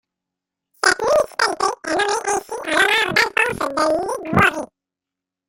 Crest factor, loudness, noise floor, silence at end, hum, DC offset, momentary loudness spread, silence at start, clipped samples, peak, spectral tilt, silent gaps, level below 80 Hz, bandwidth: 20 dB; -18 LUFS; -86 dBFS; 0.85 s; none; under 0.1%; 7 LU; 0.85 s; under 0.1%; -2 dBFS; -3 dB/octave; none; -52 dBFS; 16.5 kHz